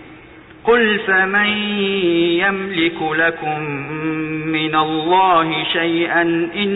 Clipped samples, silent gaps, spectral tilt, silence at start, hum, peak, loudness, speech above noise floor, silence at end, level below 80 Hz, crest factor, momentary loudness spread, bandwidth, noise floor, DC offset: under 0.1%; none; -8.5 dB/octave; 0 s; none; -4 dBFS; -16 LUFS; 24 dB; 0 s; -52 dBFS; 12 dB; 8 LU; 4.1 kHz; -41 dBFS; under 0.1%